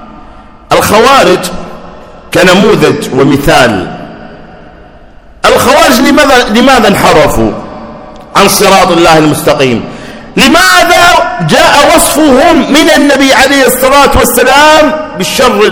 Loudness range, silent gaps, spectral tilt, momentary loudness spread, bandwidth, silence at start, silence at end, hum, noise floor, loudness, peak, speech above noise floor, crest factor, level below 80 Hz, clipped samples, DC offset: 4 LU; none; -3.5 dB/octave; 11 LU; over 20 kHz; 0 s; 0 s; none; -32 dBFS; -4 LUFS; 0 dBFS; 28 dB; 6 dB; -26 dBFS; 10%; under 0.1%